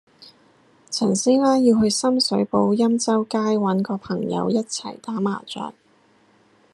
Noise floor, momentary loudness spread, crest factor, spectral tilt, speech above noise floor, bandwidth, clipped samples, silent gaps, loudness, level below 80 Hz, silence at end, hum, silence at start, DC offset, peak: -58 dBFS; 12 LU; 16 dB; -5 dB/octave; 38 dB; 12 kHz; under 0.1%; none; -21 LUFS; -64 dBFS; 1 s; none; 0.2 s; under 0.1%; -4 dBFS